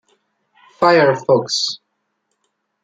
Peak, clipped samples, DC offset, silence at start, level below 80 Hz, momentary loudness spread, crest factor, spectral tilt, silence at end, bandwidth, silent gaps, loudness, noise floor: -2 dBFS; under 0.1%; under 0.1%; 0.8 s; -64 dBFS; 9 LU; 18 dB; -4 dB/octave; 1.1 s; 9.4 kHz; none; -15 LUFS; -71 dBFS